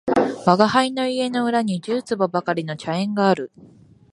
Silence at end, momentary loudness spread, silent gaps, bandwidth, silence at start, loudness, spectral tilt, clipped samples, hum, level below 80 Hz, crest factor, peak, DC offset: 0.45 s; 8 LU; none; 11.5 kHz; 0.05 s; -21 LUFS; -6 dB/octave; under 0.1%; none; -60 dBFS; 20 dB; 0 dBFS; under 0.1%